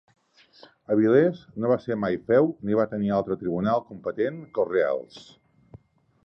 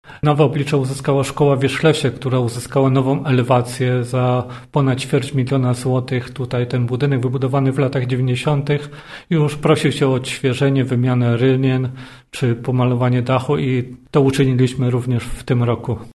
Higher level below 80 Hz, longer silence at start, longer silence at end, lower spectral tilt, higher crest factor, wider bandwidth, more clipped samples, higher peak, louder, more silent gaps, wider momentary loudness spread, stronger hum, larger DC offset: second, -62 dBFS vs -44 dBFS; first, 0.9 s vs 0.05 s; first, 1.05 s vs 0.05 s; first, -9 dB/octave vs -7 dB/octave; about the same, 18 dB vs 18 dB; second, 7.2 kHz vs 12.5 kHz; neither; second, -8 dBFS vs 0 dBFS; second, -25 LUFS vs -18 LUFS; neither; about the same, 9 LU vs 7 LU; neither; neither